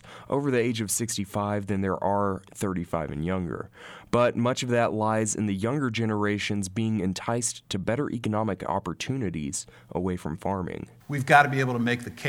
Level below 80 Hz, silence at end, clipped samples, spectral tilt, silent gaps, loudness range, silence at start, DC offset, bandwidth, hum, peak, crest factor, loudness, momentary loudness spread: -54 dBFS; 0 s; under 0.1%; -5 dB/octave; none; 4 LU; 0.05 s; under 0.1%; 17.5 kHz; none; -2 dBFS; 24 dB; -27 LUFS; 8 LU